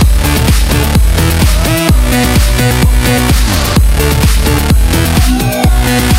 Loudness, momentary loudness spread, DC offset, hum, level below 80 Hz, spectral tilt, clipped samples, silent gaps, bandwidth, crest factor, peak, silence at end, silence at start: -10 LUFS; 1 LU; under 0.1%; none; -10 dBFS; -5 dB/octave; under 0.1%; none; 16.5 kHz; 8 dB; 0 dBFS; 0 s; 0 s